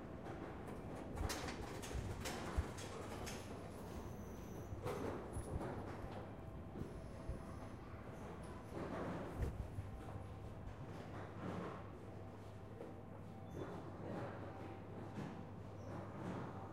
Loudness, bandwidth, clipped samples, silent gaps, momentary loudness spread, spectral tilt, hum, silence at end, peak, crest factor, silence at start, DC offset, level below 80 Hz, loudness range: -49 LUFS; 16 kHz; under 0.1%; none; 8 LU; -6 dB/octave; none; 0 s; -28 dBFS; 20 dB; 0 s; under 0.1%; -56 dBFS; 4 LU